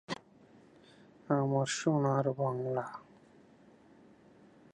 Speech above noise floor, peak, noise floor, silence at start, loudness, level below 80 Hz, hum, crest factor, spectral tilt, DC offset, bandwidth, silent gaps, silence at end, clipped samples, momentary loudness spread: 29 dB; -14 dBFS; -61 dBFS; 0.1 s; -33 LUFS; -78 dBFS; none; 20 dB; -6 dB/octave; under 0.1%; 11 kHz; none; 1.75 s; under 0.1%; 14 LU